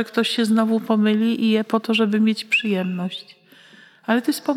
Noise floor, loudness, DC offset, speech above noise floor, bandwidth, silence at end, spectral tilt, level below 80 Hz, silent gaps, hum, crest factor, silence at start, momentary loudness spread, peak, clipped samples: -49 dBFS; -20 LUFS; under 0.1%; 29 dB; 15 kHz; 0 s; -5.5 dB/octave; -86 dBFS; none; none; 16 dB; 0 s; 8 LU; -4 dBFS; under 0.1%